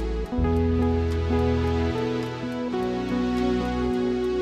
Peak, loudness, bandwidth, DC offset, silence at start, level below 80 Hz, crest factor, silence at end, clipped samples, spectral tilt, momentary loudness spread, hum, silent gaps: -12 dBFS; -25 LUFS; 9 kHz; under 0.1%; 0 s; -32 dBFS; 14 dB; 0 s; under 0.1%; -8 dB/octave; 5 LU; none; none